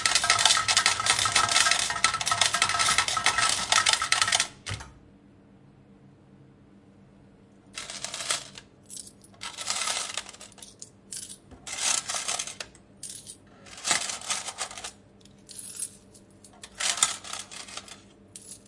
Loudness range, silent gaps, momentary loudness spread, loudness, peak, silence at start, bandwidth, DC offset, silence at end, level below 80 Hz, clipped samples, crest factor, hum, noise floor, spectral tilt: 15 LU; none; 22 LU; -24 LUFS; -2 dBFS; 0 s; 11.5 kHz; under 0.1%; 0.1 s; -60 dBFS; under 0.1%; 28 dB; 50 Hz at -60 dBFS; -55 dBFS; 0.5 dB/octave